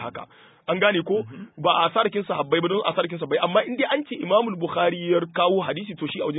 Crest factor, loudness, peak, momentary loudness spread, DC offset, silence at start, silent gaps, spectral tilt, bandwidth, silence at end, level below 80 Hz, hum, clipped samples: 18 dB; -23 LUFS; -4 dBFS; 9 LU; under 0.1%; 0 s; none; -10 dB/octave; 4 kHz; 0 s; -68 dBFS; none; under 0.1%